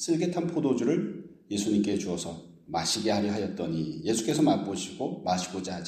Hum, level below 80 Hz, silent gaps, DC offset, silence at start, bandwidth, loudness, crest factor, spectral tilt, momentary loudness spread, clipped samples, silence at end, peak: none; -62 dBFS; none; under 0.1%; 0 s; 15 kHz; -29 LUFS; 16 dB; -5 dB/octave; 10 LU; under 0.1%; 0 s; -12 dBFS